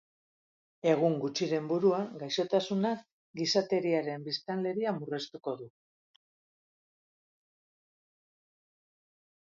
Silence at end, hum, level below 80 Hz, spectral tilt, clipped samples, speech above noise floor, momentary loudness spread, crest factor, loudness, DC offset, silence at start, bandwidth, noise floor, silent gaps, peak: 3.8 s; none; -82 dBFS; -5.5 dB/octave; under 0.1%; over 59 dB; 11 LU; 22 dB; -31 LUFS; under 0.1%; 0.85 s; 7.6 kHz; under -90 dBFS; 3.12-3.34 s; -12 dBFS